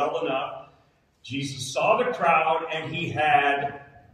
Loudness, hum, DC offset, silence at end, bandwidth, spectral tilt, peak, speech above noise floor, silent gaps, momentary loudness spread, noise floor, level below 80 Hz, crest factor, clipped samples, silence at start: -24 LUFS; none; under 0.1%; 0.3 s; 13 kHz; -4 dB/octave; -8 dBFS; 38 dB; none; 14 LU; -62 dBFS; -64 dBFS; 18 dB; under 0.1%; 0 s